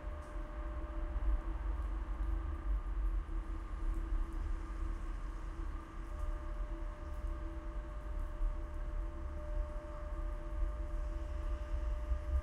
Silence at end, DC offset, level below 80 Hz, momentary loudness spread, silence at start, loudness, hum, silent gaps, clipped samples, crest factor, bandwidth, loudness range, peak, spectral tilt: 0 s; under 0.1%; -38 dBFS; 6 LU; 0 s; -44 LUFS; none; none; under 0.1%; 14 dB; 6.6 kHz; 3 LU; -24 dBFS; -7.5 dB/octave